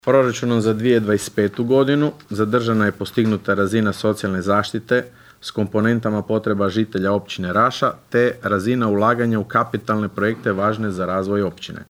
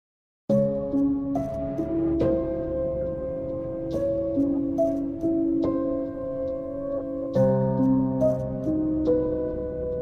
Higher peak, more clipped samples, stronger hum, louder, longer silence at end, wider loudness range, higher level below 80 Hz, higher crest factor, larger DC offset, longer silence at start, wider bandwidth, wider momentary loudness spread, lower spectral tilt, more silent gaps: first, -2 dBFS vs -10 dBFS; neither; neither; first, -19 LUFS vs -26 LUFS; about the same, 0.1 s vs 0 s; about the same, 2 LU vs 2 LU; second, -56 dBFS vs -44 dBFS; about the same, 16 dB vs 14 dB; neither; second, 0.05 s vs 0.5 s; first, 16 kHz vs 6.6 kHz; second, 5 LU vs 8 LU; second, -6.5 dB/octave vs -10.5 dB/octave; neither